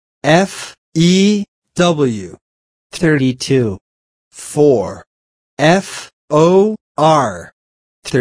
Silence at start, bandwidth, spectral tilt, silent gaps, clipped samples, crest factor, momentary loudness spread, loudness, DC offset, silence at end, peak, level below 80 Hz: 0.25 s; 11 kHz; -5.5 dB/octave; 0.78-0.92 s, 1.48-1.62 s, 2.41-2.90 s, 3.81-4.31 s, 5.07-5.57 s, 6.13-6.28 s, 6.81-6.95 s, 7.53-8.02 s; under 0.1%; 14 dB; 19 LU; -14 LUFS; under 0.1%; 0 s; 0 dBFS; -52 dBFS